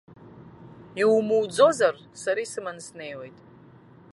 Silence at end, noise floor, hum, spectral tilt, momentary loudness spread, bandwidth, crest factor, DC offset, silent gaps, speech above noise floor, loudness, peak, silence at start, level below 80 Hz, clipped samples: 0.85 s; -51 dBFS; none; -4 dB/octave; 19 LU; 11.5 kHz; 22 dB; under 0.1%; none; 27 dB; -23 LUFS; -6 dBFS; 0.25 s; -68 dBFS; under 0.1%